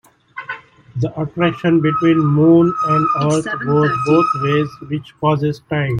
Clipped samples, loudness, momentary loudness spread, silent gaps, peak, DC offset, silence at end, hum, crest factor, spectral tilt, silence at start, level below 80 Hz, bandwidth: under 0.1%; -16 LUFS; 16 LU; none; -2 dBFS; under 0.1%; 0 s; none; 14 dB; -7.5 dB/octave; 0.35 s; -52 dBFS; 10.5 kHz